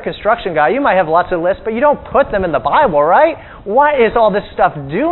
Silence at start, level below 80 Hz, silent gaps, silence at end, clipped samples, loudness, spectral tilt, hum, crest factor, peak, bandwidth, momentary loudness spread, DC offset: 0 s; -38 dBFS; none; 0 s; under 0.1%; -13 LUFS; -9.5 dB/octave; none; 12 dB; 0 dBFS; 4.2 kHz; 6 LU; under 0.1%